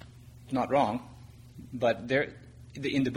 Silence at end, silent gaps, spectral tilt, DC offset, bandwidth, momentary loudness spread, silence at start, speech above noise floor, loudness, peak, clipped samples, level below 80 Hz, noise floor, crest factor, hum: 0 s; none; -6.5 dB/octave; under 0.1%; 14 kHz; 23 LU; 0 s; 21 dB; -30 LUFS; -12 dBFS; under 0.1%; -58 dBFS; -50 dBFS; 18 dB; none